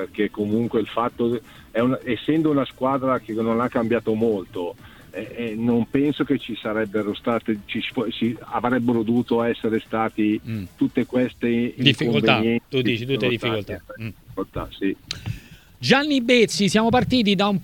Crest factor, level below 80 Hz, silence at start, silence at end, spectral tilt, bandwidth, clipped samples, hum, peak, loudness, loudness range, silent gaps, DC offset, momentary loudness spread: 22 dB; -50 dBFS; 0 s; 0 s; -5.5 dB/octave; 17.5 kHz; under 0.1%; none; 0 dBFS; -22 LUFS; 3 LU; none; under 0.1%; 13 LU